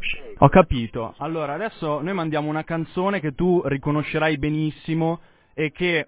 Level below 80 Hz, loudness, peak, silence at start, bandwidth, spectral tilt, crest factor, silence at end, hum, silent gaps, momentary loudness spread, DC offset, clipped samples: -40 dBFS; -23 LUFS; 0 dBFS; 0 s; 4 kHz; -11 dB/octave; 22 dB; 0 s; none; none; 11 LU; under 0.1%; under 0.1%